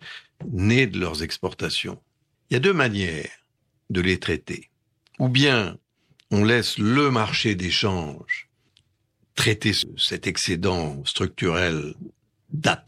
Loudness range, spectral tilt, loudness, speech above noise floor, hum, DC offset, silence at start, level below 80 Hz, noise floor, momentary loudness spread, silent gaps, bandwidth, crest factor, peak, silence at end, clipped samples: 4 LU; -4.5 dB/octave; -23 LUFS; 46 dB; none; under 0.1%; 0 s; -50 dBFS; -69 dBFS; 14 LU; none; 15 kHz; 18 dB; -6 dBFS; 0.05 s; under 0.1%